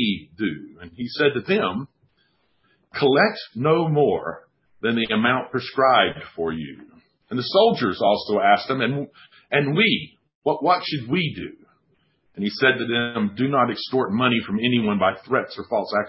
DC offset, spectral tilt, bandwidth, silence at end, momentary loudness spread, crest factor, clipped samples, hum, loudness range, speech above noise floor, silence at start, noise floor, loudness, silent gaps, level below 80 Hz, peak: under 0.1%; -10 dB/octave; 5.8 kHz; 0 s; 13 LU; 20 dB; under 0.1%; none; 3 LU; 45 dB; 0 s; -66 dBFS; -21 LUFS; 10.35-10.42 s; -58 dBFS; -2 dBFS